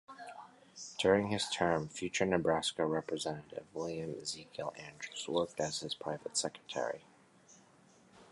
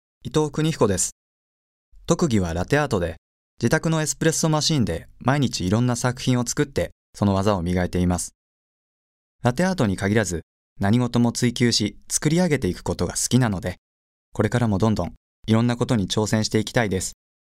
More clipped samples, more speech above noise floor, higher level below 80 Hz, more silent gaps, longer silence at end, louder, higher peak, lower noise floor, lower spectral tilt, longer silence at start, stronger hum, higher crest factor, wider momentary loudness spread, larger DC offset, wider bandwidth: neither; second, 28 dB vs over 69 dB; second, -66 dBFS vs -44 dBFS; second, none vs 1.12-1.92 s, 3.18-3.57 s, 6.92-7.13 s, 8.35-9.39 s, 10.43-10.76 s, 13.78-14.32 s, 15.17-15.43 s; second, 0.05 s vs 0.35 s; second, -36 LUFS vs -22 LUFS; second, -14 dBFS vs -4 dBFS; second, -64 dBFS vs under -90 dBFS; second, -3.5 dB/octave vs -5 dB/octave; second, 0.1 s vs 0.25 s; neither; about the same, 24 dB vs 20 dB; first, 16 LU vs 7 LU; neither; second, 11.5 kHz vs 16 kHz